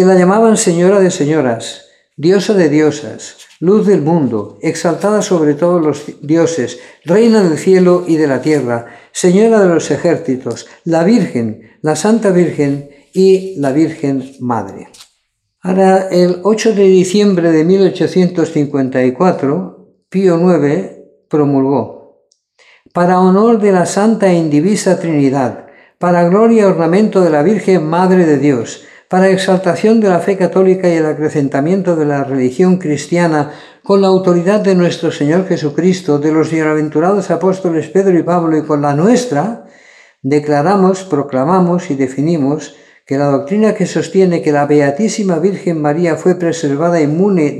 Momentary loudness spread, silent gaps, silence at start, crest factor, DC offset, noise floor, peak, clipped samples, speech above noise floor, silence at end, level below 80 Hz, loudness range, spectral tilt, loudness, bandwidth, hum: 9 LU; none; 0 s; 12 dB; under 0.1%; -65 dBFS; 0 dBFS; under 0.1%; 54 dB; 0 s; -60 dBFS; 3 LU; -6.5 dB/octave; -12 LUFS; 12 kHz; none